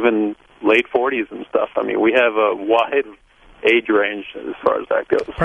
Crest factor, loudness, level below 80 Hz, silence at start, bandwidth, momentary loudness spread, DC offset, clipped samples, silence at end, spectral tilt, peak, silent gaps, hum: 18 dB; -18 LUFS; -48 dBFS; 0 s; 8.8 kHz; 8 LU; under 0.1%; under 0.1%; 0 s; -6 dB/octave; -2 dBFS; none; none